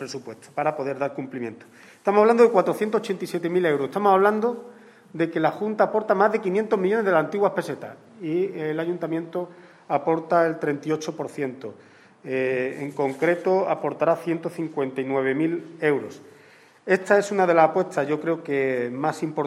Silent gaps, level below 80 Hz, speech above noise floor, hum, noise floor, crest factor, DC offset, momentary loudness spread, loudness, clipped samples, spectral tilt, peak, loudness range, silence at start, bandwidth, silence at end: none; -76 dBFS; 29 dB; none; -52 dBFS; 20 dB; under 0.1%; 14 LU; -23 LUFS; under 0.1%; -6.5 dB/octave; -4 dBFS; 5 LU; 0 s; 13.5 kHz; 0 s